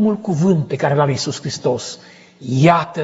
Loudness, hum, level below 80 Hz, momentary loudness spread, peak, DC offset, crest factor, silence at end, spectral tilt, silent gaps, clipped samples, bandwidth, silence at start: -17 LUFS; none; -58 dBFS; 14 LU; 0 dBFS; under 0.1%; 18 dB; 0 s; -6 dB/octave; none; under 0.1%; 8 kHz; 0 s